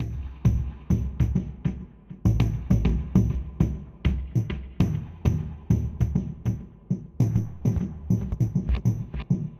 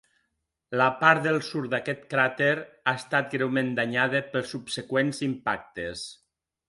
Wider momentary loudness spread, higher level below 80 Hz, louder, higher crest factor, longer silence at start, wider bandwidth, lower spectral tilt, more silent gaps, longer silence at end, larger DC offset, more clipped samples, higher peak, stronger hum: second, 8 LU vs 12 LU; first, -32 dBFS vs -64 dBFS; about the same, -27 LUFS vs -26 LUFS; about the same, 18 dB vs 22 dB; second, 0 s vs 0.7 s; about the same, 12.5 kHz vs 11.5 kHz; first, -8.5 dB/octave vs -5 dB/octave; neither; second, 0 s vs 0.55 s; neither; neither; second, -8 dBFS vs -4 dBFS; neither